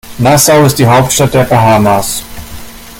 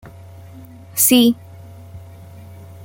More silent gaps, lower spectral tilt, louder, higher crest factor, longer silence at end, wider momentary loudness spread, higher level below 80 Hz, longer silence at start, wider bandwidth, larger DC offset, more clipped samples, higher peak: neither; first, -4.5 dB/octave vs -3 dB/octave; first, -7 LUFS vs -15 LUFS; second, 8 dB vs 20 dB; about the same, 0 s vs 0 s; second, 21 LU vs 27 LU; first, -32 dBFS vs -56 dBFS; second, 0.05 s vs 0.95 s; about the same, 17.5 kHz vs 17 kHz; neither; neither; about the same, 0 dBFS vs -2 dBFS